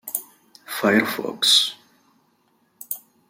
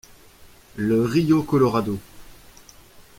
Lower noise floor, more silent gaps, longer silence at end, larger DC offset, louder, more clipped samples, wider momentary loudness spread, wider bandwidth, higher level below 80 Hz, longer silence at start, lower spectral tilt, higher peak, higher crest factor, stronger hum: first, -64 dBFS vs -49 dBFS; neither; first, 0.3 s vs 0.15 s; neither; about the same, -20 LUFS vs -21 LUFS; neither; first, 17 LU vs 13 LU; about the same, 16.5 kHz vs 16.5 kHz; second, -72 dBFS vs -50 dBFS; second, 0.05 s vs 0.4 s; second, -2 dB/octave vs -7.5 dB/octave; about the same, -4 dBFS vs -6 dBFS; about the same, 20 dB vs 18 dB; neither